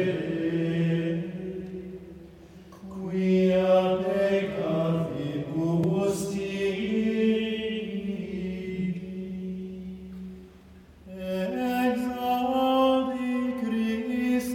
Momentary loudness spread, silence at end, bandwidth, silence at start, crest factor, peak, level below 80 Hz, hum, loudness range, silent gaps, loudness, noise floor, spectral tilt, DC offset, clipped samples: 17 LU; 0 s; 17 kHz; 0 s; 16 dB; -10 dBFS; -56 dBFS; none; 8 LU; none; -27 LUFS; -51 dBFS; -7 dB/octave; under 0.1%; under 0.1%